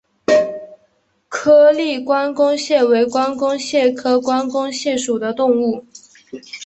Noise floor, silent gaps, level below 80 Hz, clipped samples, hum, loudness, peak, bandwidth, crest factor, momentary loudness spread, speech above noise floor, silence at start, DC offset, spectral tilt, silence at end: -61 dBFS; none; -62 dBFS; under 0.1%; none; -16 LUFS; -2 dBFS; 8.4 kHz; 14 dB; 14 LU; 45 dB; 0.3 s; under 0.1%; -3.5 dB/octave; 0 s